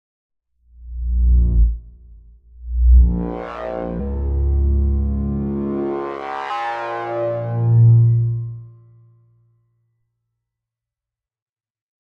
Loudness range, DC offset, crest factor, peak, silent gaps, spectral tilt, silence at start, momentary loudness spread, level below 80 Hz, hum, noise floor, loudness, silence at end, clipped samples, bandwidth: 4 LU; under 0.1%; 16 dB; -2 dBFS; none; -10 dB/octave; 0.8 s; 13 LU; -22 dBFS; none; -88 dBFS; -19 LUFS; 3.3 s; under 0.1%; 4.3 kHz